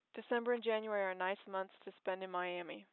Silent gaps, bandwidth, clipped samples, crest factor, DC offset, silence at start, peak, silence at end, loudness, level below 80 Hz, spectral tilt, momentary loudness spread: none; 4.3 kHz; under 0.1%; 16 dB; under 0.1%; 0.15 s; -24 dBFS; 0.1 s; -40 LUFS; under -90 dBFS; -2 dB/octave; 8 LU